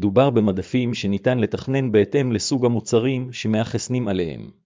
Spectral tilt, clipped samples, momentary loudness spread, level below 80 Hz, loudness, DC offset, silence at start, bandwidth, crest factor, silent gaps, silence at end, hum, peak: -6 dB/octave; under 0.1%; 6 LU; -48 dBFS; -21 LUFS; under 0.1%; 0 s; 7.6 kHz; 16 dB; none; 0.15 s; none; -4 dBFS